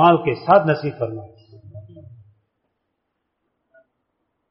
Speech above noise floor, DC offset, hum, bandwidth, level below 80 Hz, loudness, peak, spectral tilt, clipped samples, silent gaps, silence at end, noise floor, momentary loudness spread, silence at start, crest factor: 58 dB; under 0.1%; none; 5.8 kHz; -60 dBFS; -18 LUFS; -2 dBFS; -5.5 dB/octave; under 0.1%; none; 2.5 s; -76 dBFS; 26 LU; 0 s; 20 dB